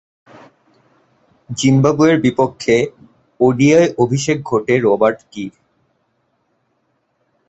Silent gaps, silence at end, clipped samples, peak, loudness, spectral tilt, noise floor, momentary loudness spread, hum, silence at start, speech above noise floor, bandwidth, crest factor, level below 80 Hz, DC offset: none; 2 s; under 0.1%; -2 dBFS; -15 LUFS; -6 dB/octave; -65 dBFS; 16 LU; none; 1.5 s; 51 dB; 8.2 kHz; 16 dB; -54 dBFS; under 0.1%